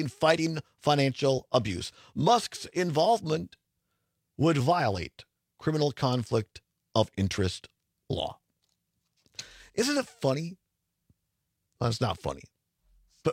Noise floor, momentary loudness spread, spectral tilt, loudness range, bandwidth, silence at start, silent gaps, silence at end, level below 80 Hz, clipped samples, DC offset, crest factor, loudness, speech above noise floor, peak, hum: -81 dBFS; 14 LU; -5.5 dB/octave; 7 LU; 16 kHz; 0 s; none; 0 s; -60 dBFS; under 0.1%; under 0.1%; 22 dB; -29 LUFS; 53 dB; -8 dBFS; none